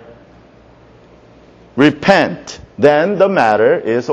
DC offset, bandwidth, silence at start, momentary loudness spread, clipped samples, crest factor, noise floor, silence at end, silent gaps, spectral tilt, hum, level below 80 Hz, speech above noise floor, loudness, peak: under 0.1%; 9 kHz; 1.75 s; 13 LU; under 0.1%; 14 dB; -44 dBFS; 0 s; none; -6 dB/octave; none; -50 dBFS; 32 dB; -12 LUFS; 0 dBFS